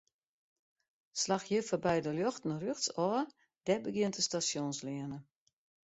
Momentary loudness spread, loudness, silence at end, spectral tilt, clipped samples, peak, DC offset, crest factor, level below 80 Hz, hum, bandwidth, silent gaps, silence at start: 10 LU; -35 LUFS; 0.7 s; -4 dB/octave; under 0.1%; -18 dBFS; under 0.1%; 18 dB; -72 dBFS; none; 8.2 kHz; none; 1.15 s